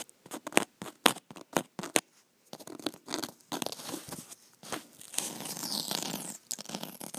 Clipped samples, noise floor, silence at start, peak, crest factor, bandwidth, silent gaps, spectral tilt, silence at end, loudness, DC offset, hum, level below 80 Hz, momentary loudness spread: under 0.1%; -66 dBFS; 0 s; 0 dBFS; 36 dB; over 20 kHz; none; -1.5 dB/octave; 0 s; -34 LUFS; under 0.1%; none; -74 dBFS; 15 LU